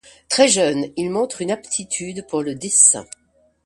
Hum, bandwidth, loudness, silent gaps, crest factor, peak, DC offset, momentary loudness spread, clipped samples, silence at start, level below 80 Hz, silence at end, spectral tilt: none; 11.5 kHz; -18 LUFS; none; 20 dB; 0 dBFS; under 0.1%; 13 LU; under 0.1%; 0.3 s; -60 dBFS; 0.6 s; -2 dB/octave